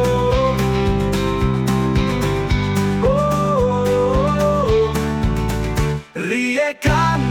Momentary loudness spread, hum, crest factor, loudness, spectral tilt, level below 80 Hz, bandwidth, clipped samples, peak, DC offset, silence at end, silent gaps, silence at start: 4 LU; none; 12 dB; -18 LUFS; -6.5 dB/octave; -28 dBFS; 18.5 kHz; under 0.1%; -6 dBFS; under 0.1%; 0 s; none; 0 s